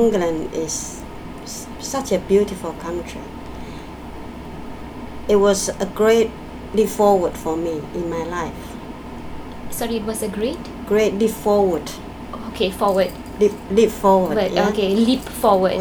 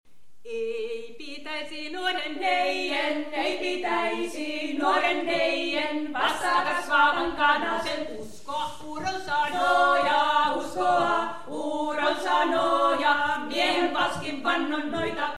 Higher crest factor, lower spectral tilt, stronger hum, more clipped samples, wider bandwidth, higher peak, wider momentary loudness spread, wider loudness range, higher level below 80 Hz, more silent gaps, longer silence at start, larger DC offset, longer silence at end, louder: about the same, 18 dB vs 18 dB; first, -5 dB/octave vs -3 dB/octave; neither; neither; first, over 20 kHz vs 14 kHz; first, -2 dBFS vs -8 dBFS; first, 18 LU vs 11 LU; first, 7 LU vs 4 LU; first, -40 dBFS vs -60 dBFS; neither; about the same, 0 s vs 0.05 s; second, under 0.1% vs 1%; about the same, 0 s vs 0 s; first, -20 LUFS vs -25 LUFS